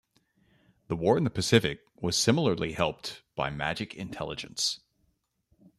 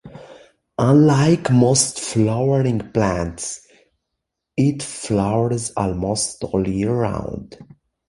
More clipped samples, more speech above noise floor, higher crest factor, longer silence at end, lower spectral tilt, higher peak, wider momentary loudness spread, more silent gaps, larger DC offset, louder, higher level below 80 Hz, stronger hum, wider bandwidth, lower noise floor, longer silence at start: neither; second, 45 dB vs 61 dB; first, 24 dB vs 16 dB; first, 1 s vs 0.45 s; about the same, -4.5 dB/octave vs -5.5 dB/octave; second, -6 dBFS vs -2 dBFS; about the same, 13 LU vs 14 LU; neither; neither; second, -29 LUFS vs -19 LUFS; second, -58 dBFS vs -44 dBFS; neither; first, 14 kHz vs 11.5 kHz; second, -74 dBFS vs -79 dBFS; first, 0.9 s vs 0.05 s